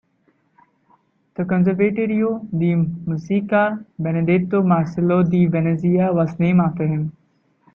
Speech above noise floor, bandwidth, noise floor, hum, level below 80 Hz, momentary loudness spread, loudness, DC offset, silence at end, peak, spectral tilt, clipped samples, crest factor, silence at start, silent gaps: 45 dB; 3.9 kHz; -63 dBFS; none; -56 dBFS; 7 LU; -19 LUFS; under 0.1%; 0.65 s; -4 dBFS; -10 dB/octave; under 0.1%; 14 dB; 1.4 s; none